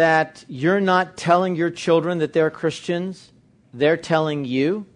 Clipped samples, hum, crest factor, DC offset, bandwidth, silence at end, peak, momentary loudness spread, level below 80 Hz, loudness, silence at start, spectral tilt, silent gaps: under 0.1%; none; 16 dB; under 0.1%; 10.5 kHz; 0.1 s; -4 dBFS; 8 LU; -64 dBFS; -21 LUFS; 0 s; -6 dB/octave; none